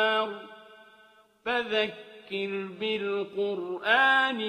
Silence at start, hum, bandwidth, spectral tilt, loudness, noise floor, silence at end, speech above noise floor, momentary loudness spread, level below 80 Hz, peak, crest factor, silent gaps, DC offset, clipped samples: 0 s; none; 9.8 kHz; -4.5 dB/octave; -28 LUFS; -59 dBFS; 0 s; 32 dB; 16 LU; -74 dBFS; -10 dBFS; 20 dB; none; under 0.1%; under 0.1%